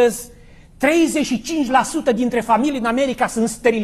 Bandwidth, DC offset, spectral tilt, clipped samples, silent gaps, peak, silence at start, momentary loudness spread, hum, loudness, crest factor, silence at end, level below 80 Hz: 14 kHz; under 0.1%; -4 dB/octave; under 0.1%; none; -2 dBFS; 0 s; 5 LU; none; -18 LUFS; 16 dB; 0 s; -46 dBFS